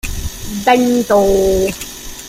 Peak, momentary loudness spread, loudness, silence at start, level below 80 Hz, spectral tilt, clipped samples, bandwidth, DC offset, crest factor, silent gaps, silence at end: 0 dBFS; 14 LU; -14 LUFS; 0.05 s; -30 dBFS; -4.5 dB/octave; under 0.1%; 16 kHz; under 0.1%; 14 dB; none; 0 s